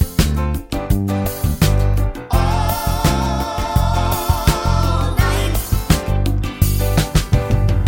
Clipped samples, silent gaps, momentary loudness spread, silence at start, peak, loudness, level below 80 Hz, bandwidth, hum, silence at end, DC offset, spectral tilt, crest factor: under 0.1%; none; 4 LU; 0 s; 0 dBFS; -18 LUFS; -20 dBFS; 17 kHz; none; 0 s; under 0.1%; -5.5 dB/octave; 16 dB